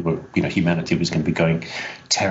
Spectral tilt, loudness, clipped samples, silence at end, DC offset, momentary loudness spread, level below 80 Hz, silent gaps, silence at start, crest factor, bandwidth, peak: -5 dB/octave; -22 LUFS; under 0.1%; 0 s; under 0.1%; 5 LU; -48 dBFS; none; 0 s; 18 dB; 8 kHz; -4 dBFS